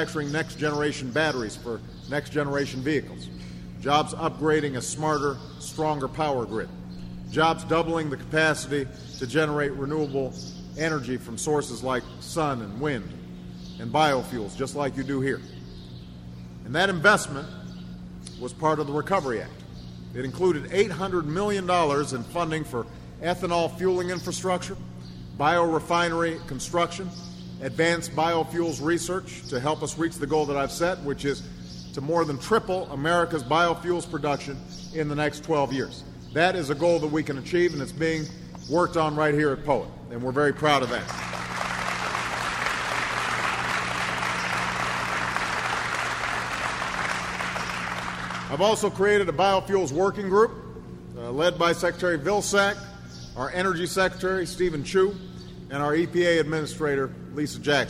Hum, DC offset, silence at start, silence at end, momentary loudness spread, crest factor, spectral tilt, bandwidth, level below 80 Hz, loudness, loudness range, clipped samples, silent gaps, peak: none; under 0.1%; 0 s; 0 s; 15 LU; 22 dB; -4.5 dB/octave; 16 kHz; -48 dBFS; -26 LUFS; 4 LU; under 0.1%; none; -6 dBFS